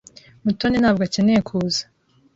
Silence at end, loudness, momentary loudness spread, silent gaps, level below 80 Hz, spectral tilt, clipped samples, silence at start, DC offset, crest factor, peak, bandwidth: 0.55 s; -20 LUFS; 7 LU; none; -48 dBFS; -5.5 dB/octave; under 0.1%; 0.45 s; under 0.1%; 16 dB; -6 dBFS; 7.8 kHz